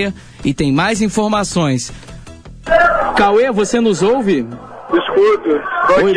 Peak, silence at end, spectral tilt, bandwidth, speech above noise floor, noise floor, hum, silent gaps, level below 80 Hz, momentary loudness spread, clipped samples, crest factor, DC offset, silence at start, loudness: -2 dBFS; 0 s; -5 dB/octave; 10.5 kHz; 21 dB; -34 dBFS; none; none; -38 dBFS; 10 LU; under 0.1%; 12 dB; under 0.1%; 0 s; -14 LUFS